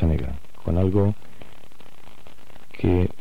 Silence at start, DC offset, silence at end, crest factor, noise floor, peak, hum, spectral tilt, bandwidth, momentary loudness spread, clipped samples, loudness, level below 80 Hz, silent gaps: 0 s; 4%; 0.1 s; 16 dB; -51 dBFS; -8 dBFS; none; -9.5 dB/octave; 5.6 kHz; 14 LU; under 0.1%; -24 LUFS; -36 dBFS; none